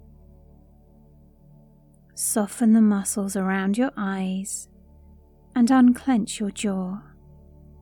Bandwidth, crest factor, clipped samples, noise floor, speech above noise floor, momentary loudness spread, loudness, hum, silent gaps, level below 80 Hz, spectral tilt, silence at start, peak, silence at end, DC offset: 18 kHz; 18 dB; under 0.1%; -54 dBFS; 32 dB; 14 LU; -23 LUFS; none; none; -54 dBFS; -5 dB/octave; 2.15 s; -8 dBFS; 0.8 s; under 0.1%